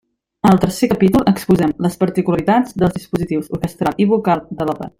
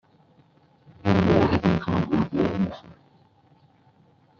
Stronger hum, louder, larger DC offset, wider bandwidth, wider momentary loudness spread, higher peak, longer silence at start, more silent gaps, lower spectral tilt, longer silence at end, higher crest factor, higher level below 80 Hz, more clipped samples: neither; first, -16 LUFS vs -23 LUFS; neither; first, 16 kHz vs 7 kHz; about the same, 8 LU vs 10 LU; about the same, -2 dBFS vs -4 dBFS; second, 0.45 s vs 1.05 s; neither; about the same, -7 dB/octave vs -7 dB/octave; second, 0.1 s vs 1.5 s; second, 14 dB vs 20 dB; first, -42 dBFS vs -50 dBFS; neither